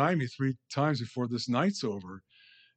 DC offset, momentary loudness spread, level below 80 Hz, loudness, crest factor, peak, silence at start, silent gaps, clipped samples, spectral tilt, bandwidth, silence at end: under 0.1%; 12 LU; -76 dBFS; -31 LUFS; 18 dB; -14 dBFS; 0 s; none; under 0.1%; -6 dB/octave; 9 kHz; 0.6 s